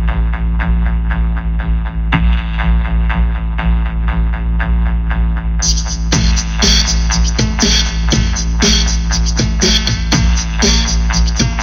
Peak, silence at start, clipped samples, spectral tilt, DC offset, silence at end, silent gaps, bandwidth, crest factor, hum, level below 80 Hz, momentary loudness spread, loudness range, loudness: 0 dBFS; 0 s; under 0.1%; -3.5 dB/octave; under 0.1%; 0 s; none; 7.4 kHz; 12 dB; none; -14 dBFS; 6 LU; 4 LU; -14 LUFS